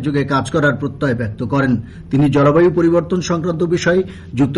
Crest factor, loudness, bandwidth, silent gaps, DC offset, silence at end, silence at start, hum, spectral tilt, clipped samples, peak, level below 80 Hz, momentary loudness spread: 12 dB; -16 LUFS; 11.5 kHz; none; under 0.1%; 0 s; 0 s; none; -7 dB/octave; under 0.1%; -4 dBFS; -42 dBFS; 8 LU